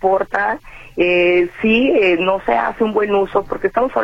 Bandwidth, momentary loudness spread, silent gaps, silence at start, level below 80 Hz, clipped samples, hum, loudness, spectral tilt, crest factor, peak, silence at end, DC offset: 7.2 kHz; 6 LU; none; 0 s; -42 dBFS; under 0.1%; none; -16 LUFS; -6.5 dB/octave; 14 dB; -2 dBFS; 0 s; under 0.1%